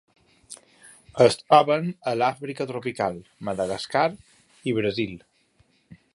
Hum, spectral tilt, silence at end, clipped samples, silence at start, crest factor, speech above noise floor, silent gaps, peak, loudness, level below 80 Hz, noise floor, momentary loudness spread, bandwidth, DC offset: none; -5.5 dB/octave; 0.95 s; under 0.1%; 0.5 s; 22 dB; 40 dB; none; -2 dBFS; -24 LUFS; -60 dBFS; -64 dBFS; 23 LU; 11.5 kHz; under 0.1%